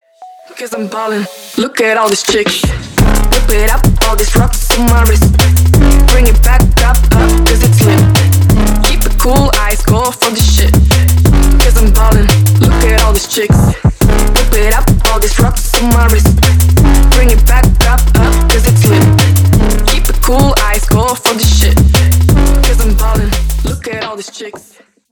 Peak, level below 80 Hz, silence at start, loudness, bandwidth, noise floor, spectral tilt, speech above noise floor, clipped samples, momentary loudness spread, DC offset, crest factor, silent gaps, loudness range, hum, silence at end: 0 dBFS; -10 dBFS; 0.2 s; -9 LUFS; 20 kHz; -44 dBFS; -5 dB/octave; 37 dB; under 0.1%; 7 LU; under 0.1%; 8 dB; none; 3 LU; none; 0.55 s